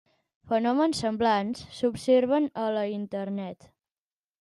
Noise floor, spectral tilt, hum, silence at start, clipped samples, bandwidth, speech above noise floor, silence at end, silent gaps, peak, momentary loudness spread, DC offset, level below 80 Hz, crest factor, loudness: under -90 dBFS; -5.5 dB/octave; none; 0.45 s; under 0.1%; 12 kHz; over 64 dB; 0.85 s; none; -12 dBFS; 11 LU; under 0.1%; -64 dBFS; 16 dB; -27 LUFS